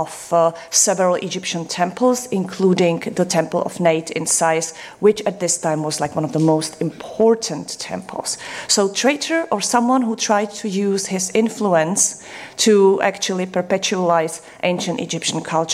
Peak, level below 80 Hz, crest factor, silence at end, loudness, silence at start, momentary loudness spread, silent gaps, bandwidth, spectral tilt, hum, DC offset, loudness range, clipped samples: -4 dBFS; -64 dBFS; 16 dB; 0 s; -18 LUFS; 0 s; 9 LU; none; 15.5 kHz; -3.5 dB/octave; none; under 0.1%; 2 LU; under 0.1%